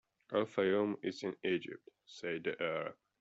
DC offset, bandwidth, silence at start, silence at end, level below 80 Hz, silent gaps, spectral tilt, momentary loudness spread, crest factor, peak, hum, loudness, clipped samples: under 0.1%; 8 kHz; 0.3 s; 0.25 s; -80 dBFS; none; -4 dB/octave; 14 LU; 18 dB; -18 dBFS; none; -37 LUFS; under 0.1%